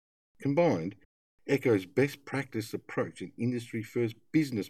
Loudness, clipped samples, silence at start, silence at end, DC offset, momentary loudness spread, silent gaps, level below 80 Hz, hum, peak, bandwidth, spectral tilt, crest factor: -31 LUFS; under 0.1%; 0.4 s; 0 s; under 0.1%; 9 LU; 1.05-1.38 s; -74 dBFS; none; -14 dBFS; 15.5 kHz; -7 dB/octave; 18 dB